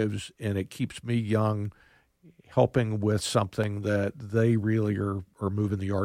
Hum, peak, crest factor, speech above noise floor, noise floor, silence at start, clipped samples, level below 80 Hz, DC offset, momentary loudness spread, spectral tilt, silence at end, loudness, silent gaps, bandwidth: none; -8 dBFS; 20 dB; 32 dB; -59 dBFS; 0 s; under 0.1%; -58 dBFS; under 0.1%; 8 LU; -6.5 dB/octave; 0 s; -28 LUFS; none; 14.5 kHz